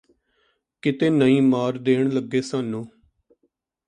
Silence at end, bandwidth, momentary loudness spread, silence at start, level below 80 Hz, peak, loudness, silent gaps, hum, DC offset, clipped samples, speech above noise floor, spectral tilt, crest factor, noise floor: 1 s; 9.6 kHz; 12 LU; 0.85 s; -66 dBFS; -6 dBFS; -21 LUFS; none; none; under 0.1%; under 0.1%; 51 dB; -7 dB/octave; 18 dB; -71 dBFS